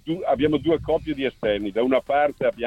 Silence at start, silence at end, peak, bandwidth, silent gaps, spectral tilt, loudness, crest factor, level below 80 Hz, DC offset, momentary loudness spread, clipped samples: 0.05 s; 0 s; -8 dBFS; 10.5 kHz; none; -7.5 dB/octave; -23 LUFS; 16 dB; -46 dBFS; under 0.1%; 4 LU; under 0.1%